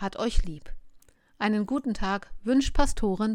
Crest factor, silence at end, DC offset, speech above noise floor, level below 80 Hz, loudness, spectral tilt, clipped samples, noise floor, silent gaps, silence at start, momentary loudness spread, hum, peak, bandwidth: 18 dB; 0 s; under 0.1%; 30 dB; -32 dBFS; -28 LUFS; -5 dB/octave; under 0.1%; -56 dBFS; none; 0 s; 8 LU; none; -8 dBFS; 11.5 kHz